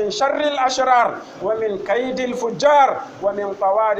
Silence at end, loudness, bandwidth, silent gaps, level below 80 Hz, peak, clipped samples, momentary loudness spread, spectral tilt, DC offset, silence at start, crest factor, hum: 0 s; -19 LUFS; 8.6 kHz; none; -58 dBFS; -4 dBFS; under 0.1%; 9 LU; -3.5 dB/octave; under 0.1%; 0 s; 16 dB; none